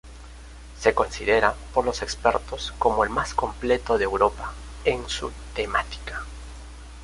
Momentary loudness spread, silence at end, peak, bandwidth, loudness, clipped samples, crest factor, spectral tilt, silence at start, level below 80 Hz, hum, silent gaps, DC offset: 21 LU; 0 s; -2 dBFS; 11.5 kHz; -24 LUFS; under 0.1%; 22 dB; -4 dB/octave; 0.05 s; -40 dBFS; none; none; under 0.1%